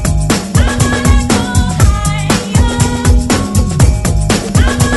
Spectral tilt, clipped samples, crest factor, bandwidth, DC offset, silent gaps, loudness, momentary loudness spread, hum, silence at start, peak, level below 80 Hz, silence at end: -5 dB/octave; 0.3%; 10 dB; 12 kHz; under 0.1%; none; -12 LUFS; 3 LU; none; 0 s; 0 dBFS; -14 dBFS; 0 s